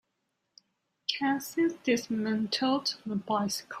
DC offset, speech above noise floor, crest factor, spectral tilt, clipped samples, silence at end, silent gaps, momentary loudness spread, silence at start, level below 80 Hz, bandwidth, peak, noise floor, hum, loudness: under 0.1%; 51 dB; 18 dB; -4 dB/octave; under 0.1%; 0 s; none; 6 LU; 1.1 s; -74 dBFS; 15.5 kHz; -14 dBFS; -81 dBFS; none; -30 LUFS